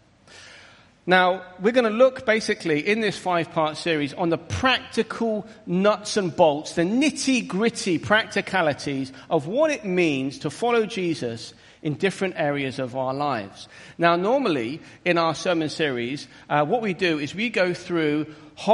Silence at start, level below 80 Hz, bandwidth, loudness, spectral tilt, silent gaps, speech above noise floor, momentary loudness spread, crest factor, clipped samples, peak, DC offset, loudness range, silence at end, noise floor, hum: 0.3 s; -60 dBFS; 11.5 kHz; -23 LUFS; -5 dB/octave; none; 27 dB; 9 LU; 20 dB; under 0.1%; -2 dBFS; under 0.1%; 3 LU; 0 s; -50 dBFS; none